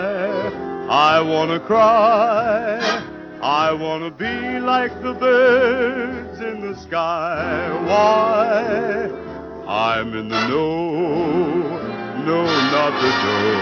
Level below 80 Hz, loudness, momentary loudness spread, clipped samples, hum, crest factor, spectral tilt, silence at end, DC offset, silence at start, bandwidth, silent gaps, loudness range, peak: -50 dBFS; -18 LUFS; 12 LU; under 0.1%; none; 16 dB; -5.5 dB/octave; 0 s; under 0.1%; 0 s; 7 kHz; none; 4 LU; -2 dBFS